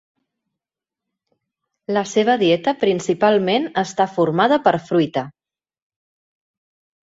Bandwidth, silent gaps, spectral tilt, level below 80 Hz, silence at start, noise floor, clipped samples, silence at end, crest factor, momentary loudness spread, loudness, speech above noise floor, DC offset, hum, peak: 8 kHz; none; -5.5 dB/octave; -64 dBFS; 1.9 s; -87 dBFS; under 0.1%; 1.75 s; 18 dB; 7 LU; -18 LUFS; 70 dB; under 0.1%; none; -2 dBFS